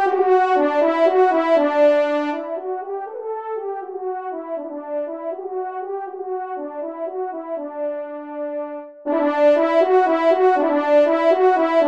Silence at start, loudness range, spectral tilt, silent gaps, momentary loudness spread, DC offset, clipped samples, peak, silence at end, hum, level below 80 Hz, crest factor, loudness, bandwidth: 0 s; 10 LU; -4 dB/octave; none; 13 LU; under 0.1%; under 0.1%; -6 dBFS; 0 s; none; -76 dBFS; 14 dB; -20 LUFS; 7.4 kHz